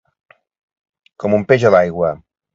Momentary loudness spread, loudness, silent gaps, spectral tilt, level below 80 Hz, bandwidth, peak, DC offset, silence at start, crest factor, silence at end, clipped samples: 13 LU; -15 LUFS; none; -7 dB/octave; -50 dBFS; 7.6 kHz; 0 dBFS; under 0.1%; 1.2 s; 18 dB; 0.4 s; under 0.1%